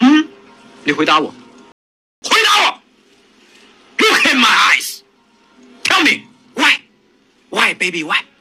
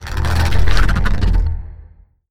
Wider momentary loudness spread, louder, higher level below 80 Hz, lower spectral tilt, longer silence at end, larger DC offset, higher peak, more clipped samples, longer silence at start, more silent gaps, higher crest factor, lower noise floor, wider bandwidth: first, 16 LU vs 9 LU; first, -13 LUFS vs -18 LUFS; second, -66 dBFS vs -18 dBFS; second, -1.5 dB/octave vs -5.5 dB/octave; first, 0.2 s vs 0 s; neither; about the same, 0 dBFS vs 0 dBFS; neither; about the same, 0 s vs 0 s; first, 1.72-2.22 s vs none; about the same, 16 dB vs 12 dB; first, -54 dBFS vs -43 dBFS; about the same, 16 kHz vs 15 kHz